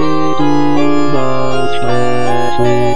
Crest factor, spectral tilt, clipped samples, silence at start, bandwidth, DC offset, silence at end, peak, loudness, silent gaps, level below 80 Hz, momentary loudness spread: 12 dB; -6.5 dB/octave; under 0.1%; 0 s; 10.5 kHz; 30%; 0 s; 0 dBFS; -14 LUFS; none; -38 dBFS; 3 LU